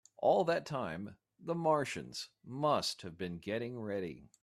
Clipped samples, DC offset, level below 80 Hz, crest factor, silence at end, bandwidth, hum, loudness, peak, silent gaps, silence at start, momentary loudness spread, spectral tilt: under 0.1%; under 0.1%; -72 dBFS; 20 dB; 0.2 s; 14.5 kHz; none; -36 LUFS; -18 dBFS; none; 0.2 s; 14 LU; -5 dB/octave